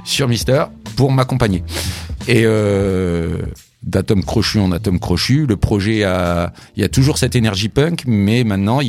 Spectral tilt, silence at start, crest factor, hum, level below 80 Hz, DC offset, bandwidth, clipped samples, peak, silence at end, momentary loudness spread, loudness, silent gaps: -6 dB/octave; 0 s; 14 dB; none; -34 dBFS; under 0.1%; 16 kHz; under 0.1%; 0 dBFS; 0 s; 8 LU; -16 LUFS; none